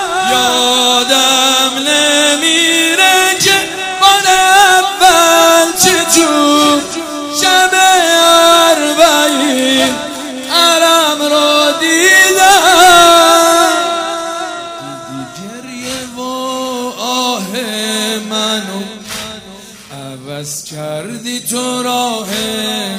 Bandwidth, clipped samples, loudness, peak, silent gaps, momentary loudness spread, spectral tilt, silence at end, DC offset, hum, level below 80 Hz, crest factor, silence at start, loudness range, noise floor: 16.5 kHz; 0.3%; -9 LUFS; 0 dBFS; none; 17 LU; -1 dB/octave; 0 s; under 0.1%; none; -48 dBFS; 10 dB; 0 s; 12 LU; -33 dBFS